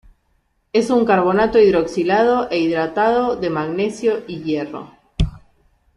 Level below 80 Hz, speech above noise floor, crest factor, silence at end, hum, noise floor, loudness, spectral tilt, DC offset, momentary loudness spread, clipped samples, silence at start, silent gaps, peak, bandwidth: -36 dBFS; 47 dB; 16 dB; 0.6 s; none; -64 dBFS; -18 LUFS; -6.5 dB/octave; under 0.1%; 10 LU; under 0.1%; 0.75 s; none; -2 dBFS; 11.5 kHz